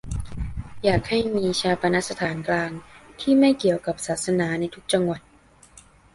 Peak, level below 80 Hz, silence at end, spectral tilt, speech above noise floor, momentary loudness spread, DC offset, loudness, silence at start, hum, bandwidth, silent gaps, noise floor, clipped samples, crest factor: -6 dBFS; -42 dBFS; 0.35 s; -5 dB/octave; 30 dB; 15 LU; under 0.1%; -23 LUFS; 0.05 s; none; 11.5 kHz; none; -52 dBFS; under 0.1%; 18 dB